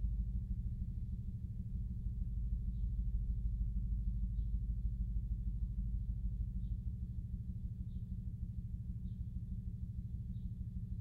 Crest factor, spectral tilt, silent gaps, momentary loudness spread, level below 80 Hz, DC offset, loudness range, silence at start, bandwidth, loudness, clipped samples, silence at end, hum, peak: 12 dB; -11 dB/octave; none; 5 LU; -40 dBFS; under 0.1%; 4 LU; 0 s; 0.7 kHz; -43 LUFS; under 0.1%; 0 s; none; -26 dBFS